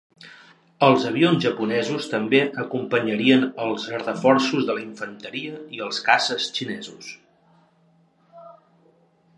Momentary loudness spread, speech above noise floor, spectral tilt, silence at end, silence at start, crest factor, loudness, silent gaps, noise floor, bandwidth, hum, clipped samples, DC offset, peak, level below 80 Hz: 15 LU; 38 dB; -5 dB/octave; 0.85 s; 0.25 s; 22 dB; -22 LUFS; none; -60 dBFS; 11.5 kHz; none; under 0.1%; under 0.1%; -2 dBFS; -74 dBFS